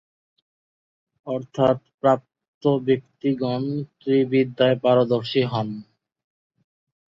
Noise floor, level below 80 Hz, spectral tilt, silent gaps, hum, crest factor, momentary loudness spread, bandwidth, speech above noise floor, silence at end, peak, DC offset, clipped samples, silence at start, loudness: under -90 dBFS; -64 dBFS; -8 dB/octave; 1.94-1.98 s, 2.48-2.61 s; none; 20 dB; 11 LU; 7.4 kHz; over 69 dB; 1.3 s; -4 dBFS; under 0.1%; under 0.1%; 1.25 s; -22 LUFS